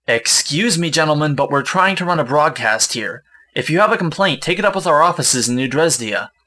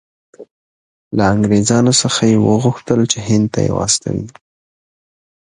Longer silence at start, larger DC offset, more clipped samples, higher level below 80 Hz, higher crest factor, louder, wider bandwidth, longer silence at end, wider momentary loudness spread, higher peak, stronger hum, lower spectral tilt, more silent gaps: second, 0.1 s vs 0.4 s; neither; neither; second, -56 dBFS vs -42 dBFS; about the same, 16 dB vs 16 dB; about the same, -15 LUFS vs -14 LUFS; about the same, 11 kHz vs 11 kHz; second, 0.2 s vs 1.3 s; second, 5 LU vs 8 LU; about the same, 0 dBFS vs 0 dBFS; neither; second, -3 dB/octave vs -4.5 dB/octave; second, none vs 0.51-1.11 s